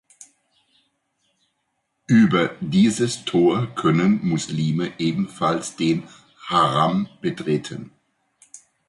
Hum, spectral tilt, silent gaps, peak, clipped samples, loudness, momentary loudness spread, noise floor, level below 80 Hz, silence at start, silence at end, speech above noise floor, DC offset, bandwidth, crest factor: none; -6 dB/octave; none; -6 dBFS; under 0.1%; -21 LUFS; 8 LU; -74 dBFS; -58 dBFS; 2.1 s; 0.3 s; 54 dB; under 0.1%; 11.5 kHz; 16 dB